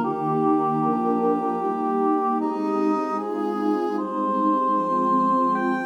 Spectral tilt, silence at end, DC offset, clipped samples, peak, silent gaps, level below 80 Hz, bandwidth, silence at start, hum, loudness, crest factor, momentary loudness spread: -8 dB/octave; 0 s; under 0.1%; under 0.1%; -10 dBFS; none; -78 dBFS; 9.2 kHz; 0 s; none; -23 LUFS; 12 dB; 4 LU